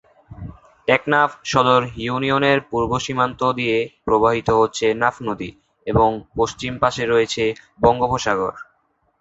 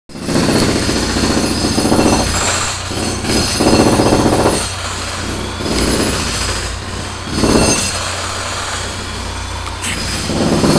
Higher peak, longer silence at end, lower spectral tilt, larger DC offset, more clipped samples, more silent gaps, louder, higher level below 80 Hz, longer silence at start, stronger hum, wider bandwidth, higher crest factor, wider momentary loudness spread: about the same, -2 dBFS vs 0 dBFS; first, 0.55 s vs 0 s; about the same, -5 dB/octave vs -4 dB/octave; second, under 0.1% vs 0.6%; neither; neither; second, -19 LUFS vs -15 LUFS; second, -44 dBFS vs -28 dBFS; first, 0.3 s vs 0.1 s; neither; second, 8 kHz vs 11 kHz; about the same, 18 dB vs 16 dB; about the same, 10 LU vs 10 LU